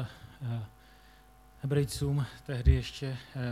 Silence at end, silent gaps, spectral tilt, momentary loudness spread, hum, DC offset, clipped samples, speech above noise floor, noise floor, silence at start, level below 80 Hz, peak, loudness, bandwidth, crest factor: 0 s; none; -6.5 dB/octave; 14 LU; none; under 0.1%; under 0.1%; 27 dB; -57 dBFS; 0 s; -36 dBFS; -10 dBFS; -33 LUFS; 15 kHz; 22 dB